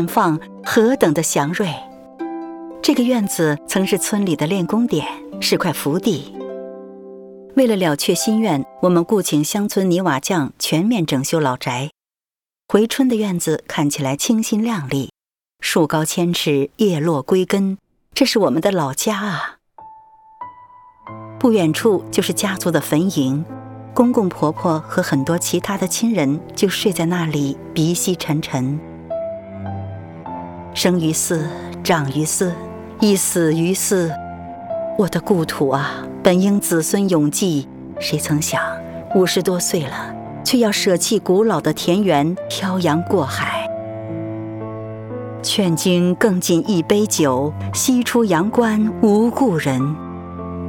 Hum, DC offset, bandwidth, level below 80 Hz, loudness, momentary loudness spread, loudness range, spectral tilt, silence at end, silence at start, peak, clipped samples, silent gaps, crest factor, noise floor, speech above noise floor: none; under 0.1%; 19.5 kHz; -54 dBFS; -18 LUFS; 14 LU; 4 LU; -4.5 dB/octave; 0 s; 0 s; 0 dBFS; under 0.1%; none; 18 dB; under -90 dBFS; over 73 dB